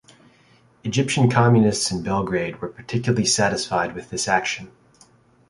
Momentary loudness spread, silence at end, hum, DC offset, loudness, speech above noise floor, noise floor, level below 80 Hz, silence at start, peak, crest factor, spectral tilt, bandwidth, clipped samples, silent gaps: 11 LU; 0.8 s; none; under 0.1%; -21 LUFS; 35 dB; -56 dBFS; -52 dBFS; 0.85 s; -2 dBFS; 20 dB; -4.5 dB/octave; 11.5 kHz; under 0.1%; none